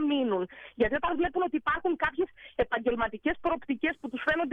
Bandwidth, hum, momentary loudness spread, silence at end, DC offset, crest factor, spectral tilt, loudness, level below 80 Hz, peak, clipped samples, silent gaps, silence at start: 5.2 kHz; none; 5 LU; 0 s; under 0.1%; 14 dB; -7 dB/octave; -30 LUFS; -50 dBFS; -14 dBFS; under 0.1%; none; 0 s